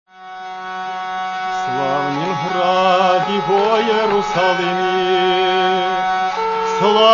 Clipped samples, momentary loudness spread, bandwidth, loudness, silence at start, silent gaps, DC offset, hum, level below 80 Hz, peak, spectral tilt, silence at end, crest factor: under 0.1%; 11 LU; 7.4 kHz; -17 LUFS; 0.15 s; none; under 0.1%; none; -52 dBFS; 0 dBFS; -4.5 dB/octave; 0 s; 16 dB